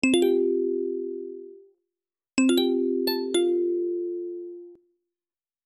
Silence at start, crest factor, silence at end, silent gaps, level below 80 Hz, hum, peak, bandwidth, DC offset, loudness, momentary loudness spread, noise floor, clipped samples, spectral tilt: 0.05 s; 18 dB; 0.9 s; none; -70 dBFS; none; -10 dBFS; 14 kHz; under 0.1%; -25 LUFS; 17 LU; under -90 dBFS; under 0.1%; -3 dB/octave